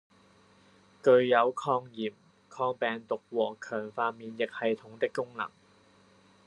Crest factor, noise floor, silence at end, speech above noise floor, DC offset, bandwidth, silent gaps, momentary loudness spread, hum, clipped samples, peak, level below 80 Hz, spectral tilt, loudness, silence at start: 22 dB; -62 dBFS; 1 s; 32 dB; under 0.1%; 10.5 kHz; none; 14 LU; none; under 0.1%; -8 dBFS; -82 dBFS; -5.5 dB/octave; -30 LUFS; 1.05 s